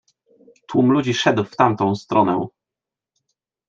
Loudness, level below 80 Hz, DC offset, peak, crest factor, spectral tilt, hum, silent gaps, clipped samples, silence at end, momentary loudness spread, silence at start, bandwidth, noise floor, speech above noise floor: -19 LUFS; -64 dBFS; under 0.1%; -2 dBFS; 18 dB; -6 dB/octave; none; none; under 0.1%; 1.2 s; 7 LU; 0.7 s; 7.6 kHz; -87 dBFS; 70 dB